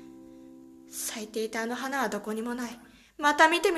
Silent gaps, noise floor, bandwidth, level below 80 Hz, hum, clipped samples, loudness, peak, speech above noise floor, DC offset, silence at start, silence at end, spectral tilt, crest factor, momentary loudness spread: none; -50 dBFS; 14 kHz; -66 dBFS; none; under 0.1%; -28 LUFS; -6 dBFS; 22 dB; under 0.1%; 0 s; 0 s; -2 dB/octave; 24 dB; 27 LU